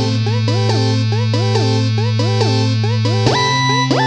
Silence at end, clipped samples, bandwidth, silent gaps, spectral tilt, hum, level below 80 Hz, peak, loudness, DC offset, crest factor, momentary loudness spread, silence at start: 0 s; under 0.1%; 8.4 kHz; none; -5.5 dB/octave; none; -48 dBFS; 0 dBFS; -15 LUFS; under 0.1%; 14 dB; 3 LU; 0 s